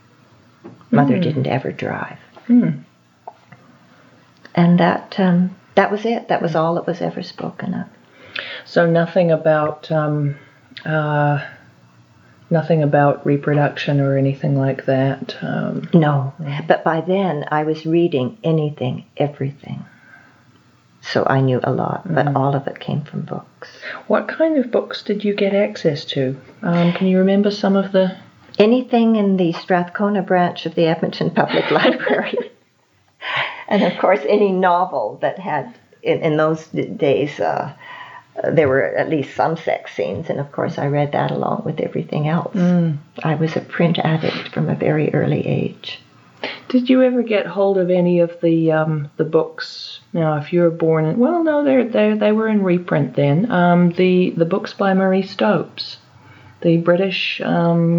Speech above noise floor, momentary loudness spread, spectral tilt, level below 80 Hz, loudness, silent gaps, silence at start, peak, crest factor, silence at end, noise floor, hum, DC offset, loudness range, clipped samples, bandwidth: 41 dB; 11 LU; -8 dB/octave; -70 dBFS; -18 LUFS; none; 0.65 s; 0 dBFS; 18 dB; 0 s; -59 dBFS; none; under 0.1%; 4 LU; under 0.1%; 7 kHz